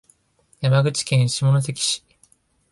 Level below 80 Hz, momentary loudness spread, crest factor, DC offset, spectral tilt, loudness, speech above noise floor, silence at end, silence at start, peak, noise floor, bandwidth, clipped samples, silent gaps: -58 dBFS; 6 LU; 16 dB; under 0.1%; -4.5 dB/octave; -20 LUFS; 42 dB; 0.75 s; 0.6 s; -6 dBFS; -61 dBFS; 11.5 kHz; under 0.1%; none